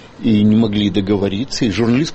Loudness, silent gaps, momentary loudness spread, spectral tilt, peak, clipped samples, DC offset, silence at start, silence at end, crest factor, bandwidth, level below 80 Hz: -16 LUFS; none; 6 LU; -6.5 dB/octave; -4 dBFS; under 0.1%; under 0.1%; 0 s; 0 s; 12 dB; 8.4 kHz; -40 dBFS